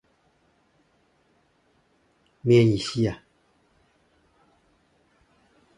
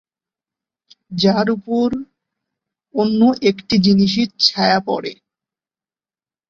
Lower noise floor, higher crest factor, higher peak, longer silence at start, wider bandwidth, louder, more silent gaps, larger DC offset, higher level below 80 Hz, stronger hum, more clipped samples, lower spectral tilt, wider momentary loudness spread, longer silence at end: second, -66 dBFS vs under -90 dBFS; about the same, 22 dB vs 18 dB; second, -8 dBFS vs 0 dBFS; first, 2.45 s vs 1.1 s; first, 11.5 kHz vs 7.4 kHz; second, -22 LUFS vs -16 LUFS; neither; neither; about the same, -58 dBFS vs -54 dBFS; neither; neither; about the same, -7 dB/octave vs -6 dB/octave; about the same, 13 LU vs 11 LU; first, 2.65 s vs 1.35 s